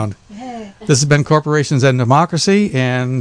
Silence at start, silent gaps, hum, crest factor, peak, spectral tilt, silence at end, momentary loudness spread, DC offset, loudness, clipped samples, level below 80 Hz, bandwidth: 0 s; none; none; 14 dB; 0 dBFS; -5.5 dB/octave; 0 s; 17 LU; under 0.1%; -14 LUFS; under 0.1%; -48 dBFS; 10 kHz